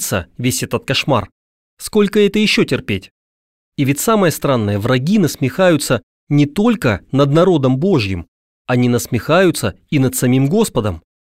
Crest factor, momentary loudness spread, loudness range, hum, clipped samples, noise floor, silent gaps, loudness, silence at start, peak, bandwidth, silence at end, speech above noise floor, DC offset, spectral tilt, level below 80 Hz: 14 dB; 8 LU; 2 LU; none; under 0.1%; under -90 dBFS; 1.32-1.77 s, 3.11-3.72 s, 6.03-6.27 s, 8.28-8.65 s; -15 LUFS; 0 s; -2 dBFS; 16 kHz; 0.25 s; over 75 dB; 0.3%; -5.5 dB/octave; -44 dBFS